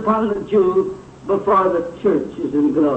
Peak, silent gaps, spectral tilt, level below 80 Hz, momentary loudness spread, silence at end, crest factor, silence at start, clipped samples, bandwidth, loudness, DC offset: -6 dBFS; none; -8.5 dB/octave; -50 dBFS; 7 LU; 0 s; 12 dB; 0 s; under 0.1%; 8.4 kHz; -18 LUFS; under 0.1%